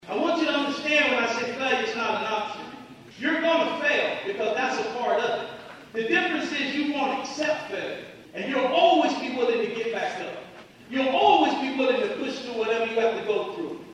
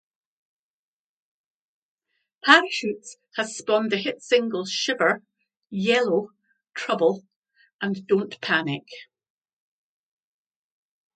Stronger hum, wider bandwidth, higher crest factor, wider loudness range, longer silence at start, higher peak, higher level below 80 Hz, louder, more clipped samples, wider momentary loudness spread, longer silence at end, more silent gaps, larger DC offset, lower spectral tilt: neither; first, 11.5 kHz vs 9.2 kHz; second, 20 dB vs 26 dB; second, 2 LU vs 7 LU; second, 0.05 s vs 2.45 s; second, -6 dBFS vs 0 dBFS; first, -70 dBFS vs -76 dBFS; about the same, -25 LUFS vs -23 LUFS; neither; second, 14 LU vs 18 LU; second, 0 s vs 2.15 s; second, none vs 7.36-7.42 s, 7.73-7.79 s; neither; about the same, -3.5 dB/octave vs -3.5 dB/octave